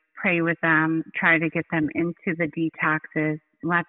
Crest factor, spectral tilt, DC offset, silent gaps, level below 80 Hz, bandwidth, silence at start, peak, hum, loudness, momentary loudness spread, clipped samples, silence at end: 16 dB; -5 dB/octave; under 0.1%; none; -66 dBFS; 4 kHz; 0.15 s; -8 dBFS; none; -23 LUFS; 7 LU; under 0.1%; 0.05 s